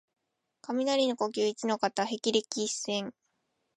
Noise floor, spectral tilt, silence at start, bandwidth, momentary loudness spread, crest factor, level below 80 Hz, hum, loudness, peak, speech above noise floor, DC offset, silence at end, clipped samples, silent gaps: -79 dBFS; -3 dB/octave; 0.7 s; 11.5 kHz; 7 LU; 20 dB; -80 dBFS; none; -30 LUFS; -12 dBFS; 49 dB; under 0.1%; 0.65 s; under 0.1%; none